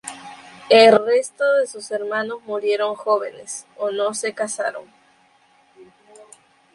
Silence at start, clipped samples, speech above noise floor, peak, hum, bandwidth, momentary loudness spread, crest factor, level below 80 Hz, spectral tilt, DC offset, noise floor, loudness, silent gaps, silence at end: 0.05 s; under 0.1%; 38 dB; -2 dBFS; none; 11.5 kHz; 21 LU; 20 dB; -72 dBFS; -2.5 dB/octave; under 0.1%; -57 dBFS; -19 LUFS; none; 0.9 s